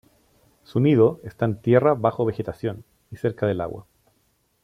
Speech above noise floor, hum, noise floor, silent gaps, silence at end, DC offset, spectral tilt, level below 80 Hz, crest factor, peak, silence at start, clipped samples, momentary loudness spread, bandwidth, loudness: 46 dB; none; -67 dBFS; none; 0.85 s; under 0.1%; -9.5 dB/octave; -58 dBFS; 18 dB; -4 dBFS; 0.75 s; under 0.1%; 13 LU; 12.5 kHz; -22 LUFS